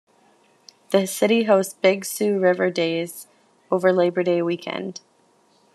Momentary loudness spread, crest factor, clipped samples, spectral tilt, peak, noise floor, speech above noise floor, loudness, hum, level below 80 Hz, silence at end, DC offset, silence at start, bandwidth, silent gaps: 13 LU; 18 dB; under 0.1%; -4.5 dB/octave; -4 dBFS; -60 dBFS; 39 dB; -21 LUFS; none; -78 dBFS; 0.75 s; under 0.1%; 0.9 s; 13.5 kHz; none